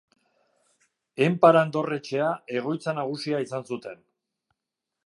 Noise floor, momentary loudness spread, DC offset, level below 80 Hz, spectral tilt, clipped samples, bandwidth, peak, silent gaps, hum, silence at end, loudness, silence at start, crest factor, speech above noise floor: -86 dBFS; 17 LU; under 0.1%; -80 dBFS; -6.5 dB/octave; under 0.1%; 11.5 kHz; -4 dBFS; none; none; 1.15 s; -25 LUFS; 1.2 s; 24 dB; 61 dB